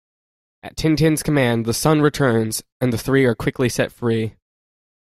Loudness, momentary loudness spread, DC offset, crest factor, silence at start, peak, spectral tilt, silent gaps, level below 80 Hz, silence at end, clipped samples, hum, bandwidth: -19 LUFS; 7 LU; under 0.1%; 18 dB; 0.65 s; -2 dBFS; -5.5 dB/octave; 2.72-2.80 s; -44 dBFS; 0.75 s; under 0.1%; none; 16 kHz